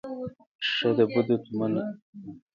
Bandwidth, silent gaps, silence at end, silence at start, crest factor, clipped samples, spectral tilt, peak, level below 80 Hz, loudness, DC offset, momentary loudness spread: 7.2 kHz; 0.47-0.59 s, 2.02-2.13 s; 0.15 s; 0.05 s; 18 dB; under 0.1%; -7 dB/octave; -10 dBFS; -70 dBFS; -27 LUFS; under 0.1%; 19 LU